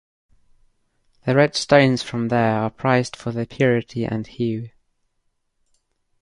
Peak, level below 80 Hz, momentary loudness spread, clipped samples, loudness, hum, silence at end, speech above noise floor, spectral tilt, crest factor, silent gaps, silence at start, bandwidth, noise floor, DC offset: -2 dBFS; -56 dBFS; 12 LU; under 0.1%; -20 LUFS; none; 1.55 s; 50 dB; -6 dB/octave; 22 dB; none; 1.25 s; 11 kHz; -70 dBFS; under 0.1%